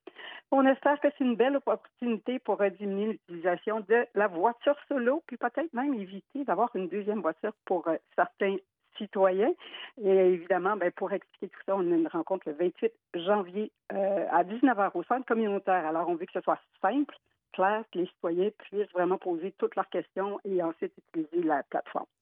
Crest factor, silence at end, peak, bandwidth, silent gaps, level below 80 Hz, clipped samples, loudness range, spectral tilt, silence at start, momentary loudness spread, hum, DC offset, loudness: 18 dB; 0.15 s; -12 dBFS; 3.8 kHz; none; under -90 dBFS; under 0.1%; 3 LU; -9.5 dB/octave; 0.2 s; 10 LU; none; under 0.1%; -30 LUFS